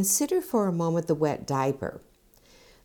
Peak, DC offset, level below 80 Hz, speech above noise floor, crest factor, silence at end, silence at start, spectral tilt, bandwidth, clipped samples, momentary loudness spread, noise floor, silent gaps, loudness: -12 dBFS; under 0.1%; -60 dBFS; 32 dB; 16 dB; 0.85 s; 0 s; -5 dB/octave; over 20 kHz; under 0.1%; 6 LU; -58 dBFS; none; -27 LUFS